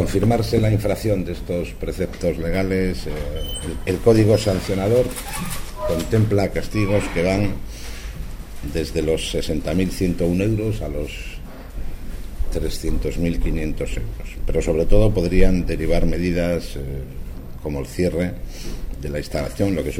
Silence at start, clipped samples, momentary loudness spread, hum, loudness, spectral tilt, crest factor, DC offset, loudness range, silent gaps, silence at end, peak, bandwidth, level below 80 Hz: 0 s; under 0.1%; 15 LU; none; -22 LUFS; -6.5 dB/octave; 18 dB; under 0.1%; 6 LU; none; 0 s; -2 dBFS; 16.5 kHz; -26 dBFS